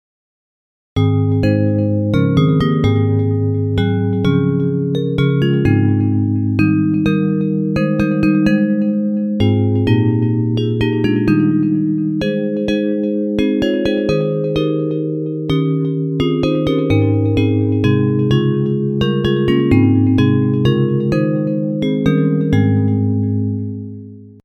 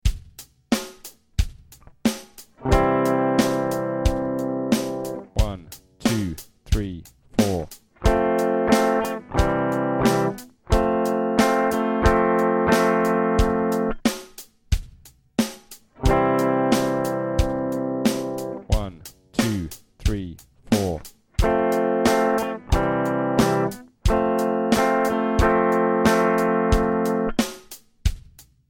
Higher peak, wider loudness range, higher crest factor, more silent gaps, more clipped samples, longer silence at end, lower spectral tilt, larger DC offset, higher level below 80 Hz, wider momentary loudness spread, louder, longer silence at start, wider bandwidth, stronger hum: about the same, 0 dBFS vs -2 dBFS; second, 3 LU vs 6 LU; second, 14 dB vs 20 dB; neither; neither; second, 0.15 s vs 0.5 s; first, -9 dB/octave vs -5.5 dB/octave; neither; second, -38 dBFS vs -32 dBFS; second, 4 LU vs 12 LU; first, -16 LUFS vs -22 LUFS; first, 0.95 s vs 0.05 s; second, 7 kHz vs 17 kHz; neither